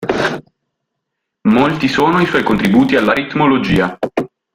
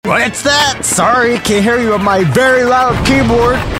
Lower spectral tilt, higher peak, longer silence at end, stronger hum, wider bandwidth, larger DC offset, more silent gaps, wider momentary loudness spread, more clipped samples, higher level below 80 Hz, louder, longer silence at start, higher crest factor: first, -6.5 dB/octave vs -4 dB/octave; about the same, -2 dBFS vs 0 dBFS; first, 0.3 s vs 0 s; neither; about the same, 16 kHz vs 16.5 kHz; neither; neither; first, 9 LU vs 2 LU; neither; second, -42 dBFS vs -30 dBFS; second, -14 LUFS vs -10 LUFS; about the same, 0 s vs 0.05 s; about the same, 14 dB vs 10 dB